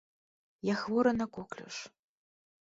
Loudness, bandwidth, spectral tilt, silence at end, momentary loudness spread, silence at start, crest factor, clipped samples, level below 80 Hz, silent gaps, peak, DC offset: -33 LUFS; 7.8 kHz; -5.5 dB/octave; 0.75 s; 15 LU; 0.65 s; 18 dB; under 0.1%; -66 dBFS; none; -16 dBFS; under 0.1%